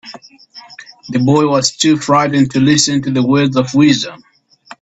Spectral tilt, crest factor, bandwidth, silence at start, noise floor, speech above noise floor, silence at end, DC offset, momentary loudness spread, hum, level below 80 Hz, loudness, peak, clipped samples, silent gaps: -4.5 dB/octave; 14 dB; 8.4 kHz; 0.05 s; -40 dBFS; 28 dB; 0.65 s; under 0.1%; 12 LU; none; -52 dBFS; -12 LUFS; 0 dBFS; under 0.1%; none